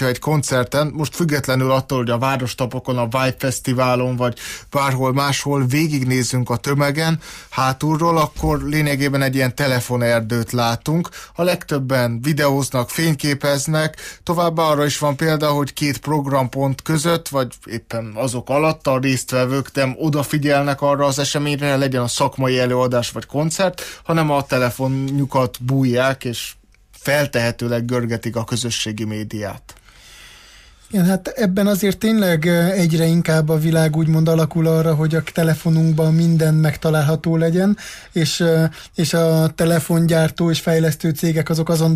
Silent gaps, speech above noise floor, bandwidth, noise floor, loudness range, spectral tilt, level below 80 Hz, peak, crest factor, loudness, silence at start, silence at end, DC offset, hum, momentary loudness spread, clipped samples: none; 28 dB; 15.5 kHz; -45 dBFS; 4 LU; -5.5 dB/octave; -44 dBFS; -6 dBFS; 12 dB; -18 LUFS; 0 s; 0 s; under 0.1%; none; 7 LU; under 0.1%